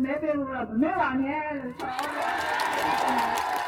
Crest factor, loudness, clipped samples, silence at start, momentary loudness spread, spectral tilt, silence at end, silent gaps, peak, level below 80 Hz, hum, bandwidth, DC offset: 18 dB; -27 LUFS; under 0.1%; 0 s; 6 LU; -4 dB/octave; 0 s; none; -10 dBFS; -58 dBFS; none; 17.5 kHz; under 0.1%